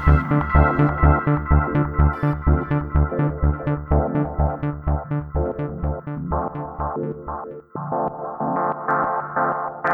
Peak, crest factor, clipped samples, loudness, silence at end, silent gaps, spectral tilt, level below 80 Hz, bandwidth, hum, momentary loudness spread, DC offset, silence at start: 0 dBFS; 20 dB; under 0.1%; -22 LUFS; 0 s; none; -11 dB/octave; -26 dBFS; 3.5 kHz; none; 10 LU; under 0.1%; 0 s